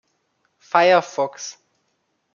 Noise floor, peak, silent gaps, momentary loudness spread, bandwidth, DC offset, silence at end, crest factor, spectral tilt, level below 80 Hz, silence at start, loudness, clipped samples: -71 dBFS; -2 dBFS; none; 19 LU; 7.2 kHz; under 0.1%; 0.85 s; 20 dB; -3.5 dB/octave; -80 dBFS; 0.75 s; -18 LUFS; under 0.1%